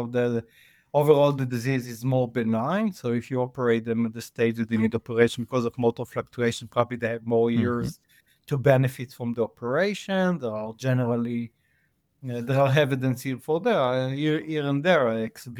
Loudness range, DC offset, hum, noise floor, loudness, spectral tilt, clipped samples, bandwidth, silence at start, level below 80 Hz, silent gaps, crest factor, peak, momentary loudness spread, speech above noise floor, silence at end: 2 LU; under 0.1%; none; -69 dBFS; -25 LUFS; -7 dB/octave; under 0.1%; 17.5 kHz; 0 s; -62 dBFS; none; 20 dB; -4 dBFS; 9 LU; 45 dB; 0 s